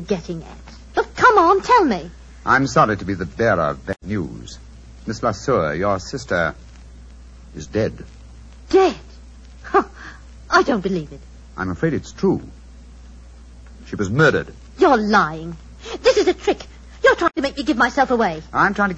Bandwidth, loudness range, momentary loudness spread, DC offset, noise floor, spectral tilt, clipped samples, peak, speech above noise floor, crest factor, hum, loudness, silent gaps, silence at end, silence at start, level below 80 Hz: 8.4 kHz; 7 LU; 21 LU; under 0.1%; -41 dBFS; -5.5 dB/octave; under 0.1%; -2 dBFS; 22 dB; 18 dB; none; -19 LUFS; none; 0 s; 0 s; -40 dBFS